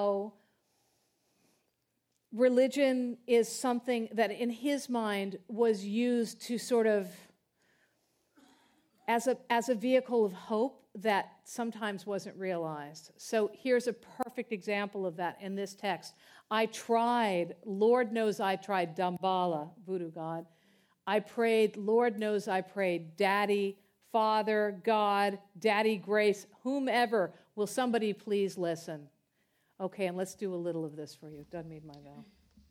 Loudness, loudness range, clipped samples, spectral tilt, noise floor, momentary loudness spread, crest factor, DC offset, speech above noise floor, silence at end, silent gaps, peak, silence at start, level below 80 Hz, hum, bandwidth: -32 LUFS; 5 LU; under 0.1%; -5 dB/octave; -80 dBFS; 12 LU; 18 dB; under 0.1%; 49 dB; 0.45 s; none; -14 dBFS; 0 s; -80 dBFS; none; 16.5 kHz